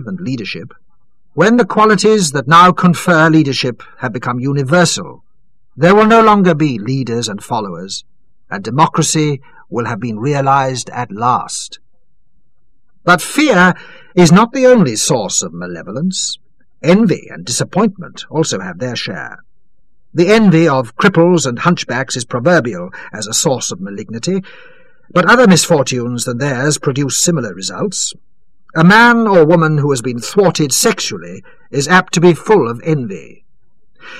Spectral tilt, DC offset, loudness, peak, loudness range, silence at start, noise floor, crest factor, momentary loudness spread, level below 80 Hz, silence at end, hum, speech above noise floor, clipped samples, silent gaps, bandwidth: -4.5 dB/octave; 1%; -12 LUFS; 0 dBFS; 6 LU; 0 s; -61 dBFS; 14 dB; 15 LU; -50 dBFS; 0 s; none; 48 dB; under 0.1%; none; 14.5 kHz